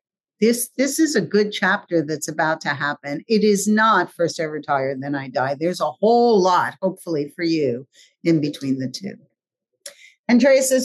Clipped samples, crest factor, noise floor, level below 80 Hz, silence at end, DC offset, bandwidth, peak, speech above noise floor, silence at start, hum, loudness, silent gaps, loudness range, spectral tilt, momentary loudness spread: under 0.1%; 14 dB; -79 dBFS; -74 dBFS; 0 s; under 0.1%; 12.5 kHz; -6 dBFS; 59 dB; 0.4 s; none; -20 LUFS; 10.19-10.24 s; 4 LU; -4.5 dB/octave; 12 LU